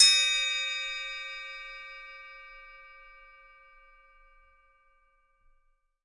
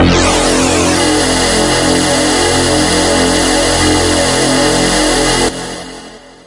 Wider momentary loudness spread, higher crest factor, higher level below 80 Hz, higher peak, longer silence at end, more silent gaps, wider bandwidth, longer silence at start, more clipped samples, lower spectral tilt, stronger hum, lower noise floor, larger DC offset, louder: first, 26 LU vs 4 LU; first, 26 dB vs 12 dB; second, -64 dBFS vs -26 dBFS; second, -6 dBFS vs 0 dBFS; first, 3.15 s vs 0.3 s; neither; about the same, 11.5 kHz vs 11.5 kHz; about the same, 0 s vs 0 s; neither; second, 5 dB/octave vs -3 dB/octave; neither; first, -70 dBFS vs -33 dBFS; neither; second, -27 LUFS vs -10 LUFS